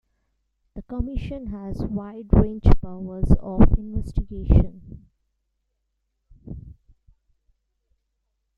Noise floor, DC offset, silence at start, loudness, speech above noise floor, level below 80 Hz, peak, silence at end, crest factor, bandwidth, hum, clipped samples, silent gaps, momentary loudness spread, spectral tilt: -76 dBFS; under 0.1%; 0.75 s; -24 LUFS; 56 dB; -26 dBFS; -2 dBFS; 1.9 s; 22 dB; 4.9 kHz; none; under 0.1%; none; 21 LU; -10.5 dB/octave